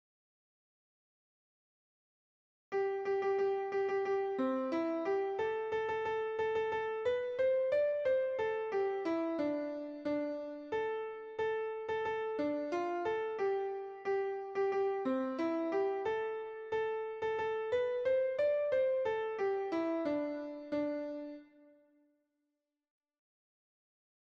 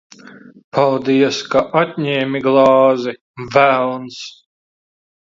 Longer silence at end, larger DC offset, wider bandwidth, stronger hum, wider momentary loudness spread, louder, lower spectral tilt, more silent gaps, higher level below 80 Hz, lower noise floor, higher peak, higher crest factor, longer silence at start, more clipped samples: first, 2.95 s vs 0.9 s; neither; about the same, 7.2 kHz vs 7.6 kHz; neither; second, 7 LU vs 16 LU; second, -36 LUFS vs -15 LUFS; about the same, -6 dB/octave vs -5.5 dB/octave; second, none vs 0.64-0.72 s, 3.21-3.34 s; second, -76 dBFS vs -58 dBFS; first, -87 dBFS vs -40 dBFS; second, -22 dBFS vs 0 dBFS; about the same, 14 dB vs 16 dB; first, 2.7 s vs 0.25 s; neither